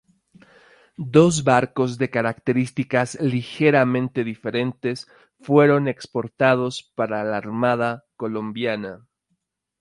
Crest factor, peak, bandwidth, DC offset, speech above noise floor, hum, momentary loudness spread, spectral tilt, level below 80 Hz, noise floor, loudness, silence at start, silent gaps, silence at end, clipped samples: 20 dB; -2 dBFS; 11.5 kHz; under 0.1%; 53 dB; none; 12 LU; -6 dB/octave; -60 dBFS; -74 dBFS; -21 LUFS; 1 s; none; 0.85 s; under 0.1%